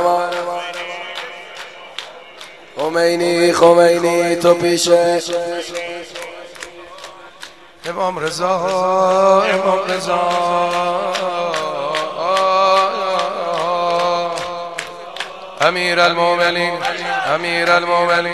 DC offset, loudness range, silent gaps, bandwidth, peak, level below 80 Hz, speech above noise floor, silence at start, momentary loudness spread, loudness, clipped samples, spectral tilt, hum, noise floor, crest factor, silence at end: 0.3%; 7 LU; none; 13 kHz; 0 dBFS; -60 dBFS; 24 dB; 0 s; 19 LU; -16 LUFS; under 0.1%; -3.5 dB/octave; none; -39 dBFS; 16 dB; 0 s